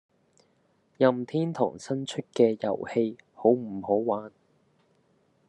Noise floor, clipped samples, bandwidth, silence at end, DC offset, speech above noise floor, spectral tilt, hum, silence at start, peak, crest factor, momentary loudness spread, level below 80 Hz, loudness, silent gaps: -68 dBFS; under 0.1%; 10.5 kHz; 1.2 s; under 0.1%; 42 dB; -7 dB/octave; none; 1 s; -8 dBFS; 22 dB; 9 LU; -80 dBFS; -27 LUFS; none